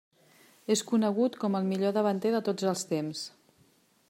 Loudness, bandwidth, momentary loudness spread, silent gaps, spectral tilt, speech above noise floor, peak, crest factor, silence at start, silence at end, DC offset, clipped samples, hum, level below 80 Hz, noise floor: -29 LUFS; 16 kHz; 10 LU; none; -5 dB/octave; 37 dB; -14 dBFS; 16 dB; 0.7 s; 0.8 s; under 0.1%; under 0.1%; none; -82 dBFS; -65 dBFS